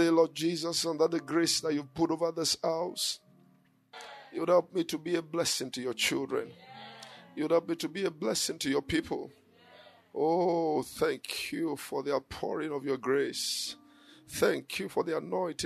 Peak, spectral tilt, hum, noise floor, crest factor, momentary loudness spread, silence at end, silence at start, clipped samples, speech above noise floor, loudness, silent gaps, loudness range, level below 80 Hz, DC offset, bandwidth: -12 dBFS; -3.5 dB/octave; none; -65 dBFS; 20 dB; 14 LU; 0 s; 0 s; under 0.1%; 34 dB; -31 LUFS; none; 2 LU; -66 dBFS; under 0.1%; 13.5 kHz